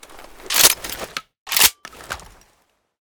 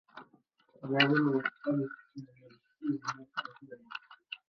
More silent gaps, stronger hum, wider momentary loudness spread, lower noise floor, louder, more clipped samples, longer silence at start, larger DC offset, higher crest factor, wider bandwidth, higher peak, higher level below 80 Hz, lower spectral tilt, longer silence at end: first, 1.38-1.46 s vs none; neither; second, 20 LU vs 25 LU; second, -64 dBFS vs -68 dBFS; first, -15 LUFS vs -32 LUFS; neither; about the same, 0.15 s vs 0.15 s; neither; second, 22 dB vs 28 dB; first, over 20 kHz vs 6.8 kHz; first, 0 dBFS vs -6 dBFS; first, -50 dBFS vs -80 dBFS; second, 1 dB/octave vs -6 dB/octave; first, 0.9 s vs 0.15 s